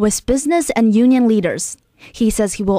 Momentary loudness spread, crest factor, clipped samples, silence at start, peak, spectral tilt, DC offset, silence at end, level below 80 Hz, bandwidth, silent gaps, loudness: 11 LU; 10 dB; under 0.1%; 0 s; -4 dBFS; -5 dB/octave; under 0.1%; 0 s; -38 dBFS; 16 kHz; none; -16 LUFS